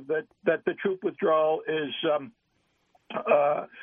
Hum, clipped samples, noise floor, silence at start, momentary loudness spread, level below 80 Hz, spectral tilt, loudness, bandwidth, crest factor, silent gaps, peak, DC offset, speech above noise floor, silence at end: none; under 0.1%; -72 dBFS; 0 s; 9 LU; -78 dBFS; -8.5 dB/octave; -27 LUFS; 3.7 kHz; 18 dB; none; -8 dBFS; under 0.1%; 45 dB; 0 s